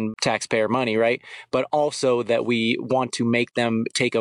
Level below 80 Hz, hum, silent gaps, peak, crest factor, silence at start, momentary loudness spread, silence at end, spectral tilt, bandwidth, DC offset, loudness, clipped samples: -64 dBFS; none; none; -8 dBFS; 14 dB; 0 s; 3 LU; 0 s; -4.5 dB/octave; 11 kHz; under 0.1%; -22 LUFS; under 0.1%